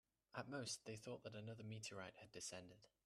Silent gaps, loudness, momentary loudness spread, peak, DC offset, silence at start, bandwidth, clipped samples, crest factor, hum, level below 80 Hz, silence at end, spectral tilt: none; -53 LUFS; 8 LU; -32 dBFS; under 0.1%; 0.35 s; 13.5 kHz; under 0.1%; 22 dB; none; -84 dBFS; 0.2 s; -3.5 dB/octave